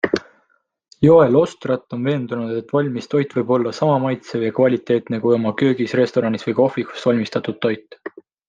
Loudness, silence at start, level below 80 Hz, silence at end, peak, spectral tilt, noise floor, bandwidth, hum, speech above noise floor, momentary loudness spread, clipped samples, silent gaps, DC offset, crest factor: -19 LUFS; 0.05 s; -58 dBFS; 0.4 s; -2 dBFS; -7.5 dB/octave; -64 dBFS; 7.8 kHz; none; 46 dB; 9 LU; under 0.1%; none; under 0.1%; 16 dB